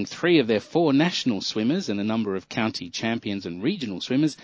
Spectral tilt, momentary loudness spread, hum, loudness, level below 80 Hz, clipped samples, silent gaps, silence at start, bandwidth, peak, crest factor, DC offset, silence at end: -5.5 dB/octave; 8 LU; none; -24 LUFS; -62 dBFS; under 0.1%; none; 0 s; 8 kHz; -6 dBFS; 18 dB; under 0.1%; 0 s